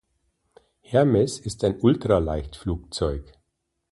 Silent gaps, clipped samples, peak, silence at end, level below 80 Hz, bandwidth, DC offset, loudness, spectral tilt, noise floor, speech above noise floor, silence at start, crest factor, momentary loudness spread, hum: none; under 0.1%; -6 dBFS; 0.7 s; -40 dBFS; 11.5 kHz; under 0.1%; -24 LUFS; -6.5 dB/octave; -77 dBFS; 55 dB; 0.9 s; 20 dB; 11 LU; none